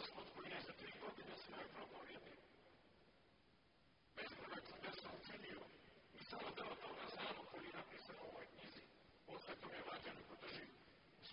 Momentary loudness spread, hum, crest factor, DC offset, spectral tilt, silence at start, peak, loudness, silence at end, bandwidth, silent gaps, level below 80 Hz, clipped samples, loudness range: 13 LU; none; 20 dB; under 0.1%; -1.5 dB/octave; 0 s; -36 dBFS; -54 LUFS; 0 s; 5.4 kHz; none; -80 dBFS; under 0.1%; 5 LU